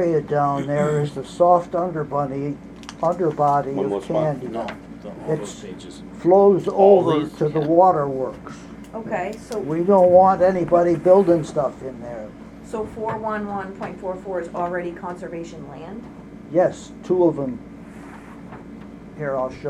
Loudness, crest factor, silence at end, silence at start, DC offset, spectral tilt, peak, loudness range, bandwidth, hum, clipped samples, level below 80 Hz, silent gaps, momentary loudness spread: -20 LUFS; 18 dB; 0 s; 0 s; under 0.1%; -7.5 dB/octave; -2 dBFS; 11 LU; 11 kHz; none; under 0.1%; -52 dBFS; none; 23 LU